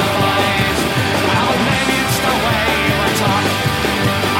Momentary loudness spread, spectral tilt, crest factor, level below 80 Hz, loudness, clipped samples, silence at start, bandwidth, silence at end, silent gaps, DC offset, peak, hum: 2 LU; -4 dB/octave; 14 dB; -34 dBFS; -15 LUFS; under 0.1%; 0 s; 16.5 kHz; 0 s; none; under 0.1%; 0 dBFS; none